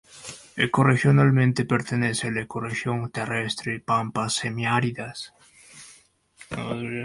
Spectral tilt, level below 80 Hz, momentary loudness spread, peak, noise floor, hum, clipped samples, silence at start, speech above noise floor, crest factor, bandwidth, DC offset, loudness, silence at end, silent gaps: -5.5 dB/octave; -58 dBFS; 20 LU; -6 dBFS; -56 dBFS; none; under 0.1%; 0.15 s; 33 dB; 18 dB; 11.5 kHz; under 0.1%; -24 LUFS; 0 s; none